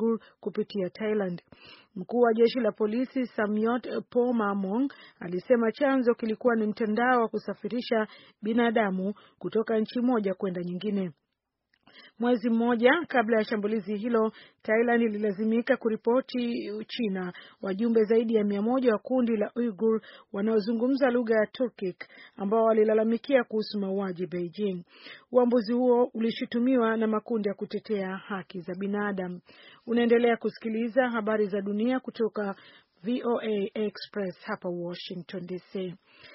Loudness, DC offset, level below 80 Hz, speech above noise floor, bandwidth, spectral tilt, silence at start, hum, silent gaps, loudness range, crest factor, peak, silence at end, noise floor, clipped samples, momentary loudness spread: -28 LUFS; under 0.1%; -74 dBFS; 55 dB; 5.8 kHz; -5 dB/octave; 0 s; none; none; 4 LU; 20 dB; -8 dBFS; 0 s; -82 dBFS; under 0.1%; 12 LU